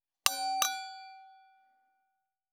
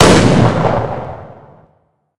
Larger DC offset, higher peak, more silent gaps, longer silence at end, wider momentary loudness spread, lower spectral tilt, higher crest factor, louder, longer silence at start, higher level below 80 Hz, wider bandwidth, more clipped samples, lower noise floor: neither; about the same, -2 dBFS vs 0 dBFS; neither; first, 1.2 s vs 0 s; about the same, 19 LU vs 20 LU; second, 2.5 dB/octave vs -5.5 dB/octave; first, 36 dB vs 14 dB; second, -31 LUFS vs -12 LUFS; first, 0.25 s vs 0 s; second, -82 dBFS vs -30 dBFS; first, over 20 kHz vs 14 kHz; second, under 0.1% vs 0.5%; first, -83 dBFS vs -58 dBFS